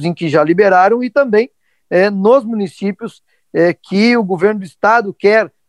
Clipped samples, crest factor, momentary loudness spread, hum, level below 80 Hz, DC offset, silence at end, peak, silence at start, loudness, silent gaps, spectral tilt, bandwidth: under 0.1%; 14 dB; 11 LU; none; -60 dBFS; under 0.1%; 0.2 s; 0 dBFS; 0 s; -13 LUFS; none; -7 dB/octave; 11 kHz